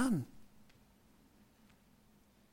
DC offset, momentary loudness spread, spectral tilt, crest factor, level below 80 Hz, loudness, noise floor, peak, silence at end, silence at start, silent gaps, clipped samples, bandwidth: under 0.1%; 29 LU; -6 dB/octave; 20 dB; -68 dBFS; -39 LUFS; -67 dBFS; -22 dBFS; 2.05 s; 0 s; none; under 0.1%; 16.5 kHz